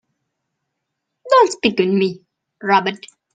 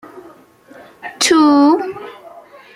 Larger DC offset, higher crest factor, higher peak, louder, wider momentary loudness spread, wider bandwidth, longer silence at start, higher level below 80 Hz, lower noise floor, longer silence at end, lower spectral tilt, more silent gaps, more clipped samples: neither; about the same, 20 dB vs 16 dB; about the same, 0 dBFS vs 0 dBFS; second, -17 LUFS vs -12 LUFS; second, 13 LU vs 23 LU; second, 9.4 kHz vs 15 kHz; first, 1.25 s vs 0.15 s; about the same, -64 dBFS vs -60 dBFS; first, -77 dBFS vs -43 dBFS; about the same, 0.4 s vs 0.5 s; first, -5 dB/octave vs -2 dB/octave; neither; neither